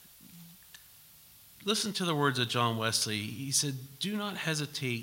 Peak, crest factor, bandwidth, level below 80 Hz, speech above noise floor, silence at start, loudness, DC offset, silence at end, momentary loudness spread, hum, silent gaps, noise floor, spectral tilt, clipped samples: -14 dBFS; 20 dB; 16.5 kHz; -72 dBFS; 25 dB; 0 s; -31 LUFS; under 0.1%; 0 s; 23 LU; none; none; -56 dBFS; -3 dB/octave; under 0.1%